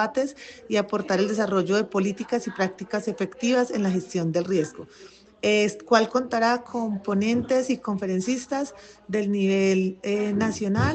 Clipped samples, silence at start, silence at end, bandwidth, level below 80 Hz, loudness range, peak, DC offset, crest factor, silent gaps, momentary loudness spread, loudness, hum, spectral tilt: under 0.1%; 0 s; 0 s; 8.8 kHz; -58 dBFS; 2 LU; -6 dBFS; under 0.1%; 20 dB; none; 8 LU; -25 LUFS; none; -5.5 dB/octave